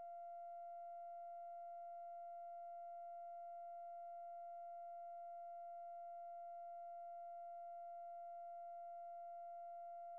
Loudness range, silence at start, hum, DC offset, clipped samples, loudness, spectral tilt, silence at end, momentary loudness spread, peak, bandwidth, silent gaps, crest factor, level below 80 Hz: 0 LU; 0 s; none; under 0.1%; under 0.1%; -54 LUFS; 4.5 dB/octave; 0 s; 0 LU; -50 dBFS; 2.8 kHz; none; 4 dB; under -90 dBFS